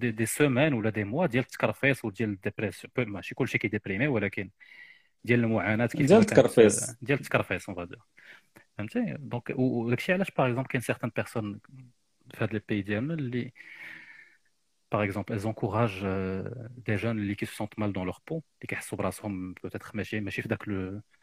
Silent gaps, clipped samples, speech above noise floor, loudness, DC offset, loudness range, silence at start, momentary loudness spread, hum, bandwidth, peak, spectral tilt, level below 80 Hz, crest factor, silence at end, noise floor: none; under 0.1%; 47 dB; -29 LUFS; under 0.1%; 10 LU; 0 s; 15 LU; none; 15.5 kHz; -4 dBFS; -6 dB/octave; -62 dBFS; 26 dB; 0.2 s; -75 dBFS